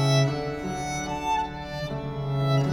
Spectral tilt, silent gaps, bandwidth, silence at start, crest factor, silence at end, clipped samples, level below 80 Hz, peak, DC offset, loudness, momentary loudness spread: -5.5 dB/octave; none; 12 kHz; 0 s; 16 dB; 0 s; under 0.1%; -46 dBFS; -10 dBFS; under 0.1%; -28 LUFS; 9 LU